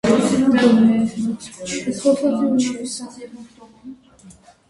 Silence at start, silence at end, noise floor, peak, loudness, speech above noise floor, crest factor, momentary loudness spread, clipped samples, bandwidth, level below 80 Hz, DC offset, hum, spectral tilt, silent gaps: 0.05 s; 0.4 s; -47 dBFS; -2 dBFS; -18 LUFS; 25 dB; 18 dB; 16 LU; under 0.1%; 11.5 kHz; -54 dBFS; under 0.1%; none; -5 dB/octave; none